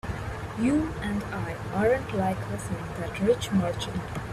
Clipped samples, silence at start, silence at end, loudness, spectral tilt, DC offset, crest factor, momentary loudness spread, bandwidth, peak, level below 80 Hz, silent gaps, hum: under 0.1%; 0.05 s; 0 s; -28 LUFS; -6.5 dB/octave; under 0.1%; 16 dB; 9 LU; 13.5 kHz; -12 dBFS; -44 dBFS; none; none